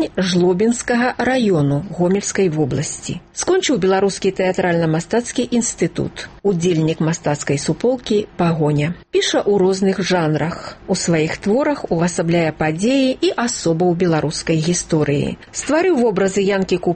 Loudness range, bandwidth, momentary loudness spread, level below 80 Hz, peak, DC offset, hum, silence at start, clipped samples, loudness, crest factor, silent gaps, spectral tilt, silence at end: 1 LU; 8.8 kHz; 5 LU; -46 dBFS; -6 dBFS; under 0.1%; none; 0 s; under 0.1%; -18 LUFS; 12 dB; none; -5 dB/octave; 0 s